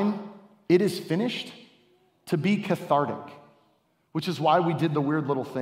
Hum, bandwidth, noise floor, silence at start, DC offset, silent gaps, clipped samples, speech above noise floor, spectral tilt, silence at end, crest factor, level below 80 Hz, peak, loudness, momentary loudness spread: none; 16 kHz; -68 dBFS; 0 s; under 0.1%; none; under 0.1%; 42 dB; -7 dB/octave; 0 s; 18 dB; -74 dBFS; -8 dBFS; -26 LUFS; 13 LU